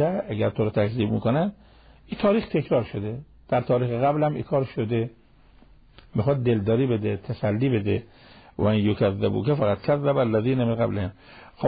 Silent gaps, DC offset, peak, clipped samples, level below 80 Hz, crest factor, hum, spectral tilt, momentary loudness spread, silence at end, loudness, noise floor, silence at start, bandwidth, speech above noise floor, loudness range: none; under 0.1%; -10 dBFS; under 0.1%; -48 dBFS; 14 dB; none; -12 dB/octave; 8 LU; 0 s; -24 LUFS; -53 dBFS; 0 s; 5 kHz; 30 dB; 2 LU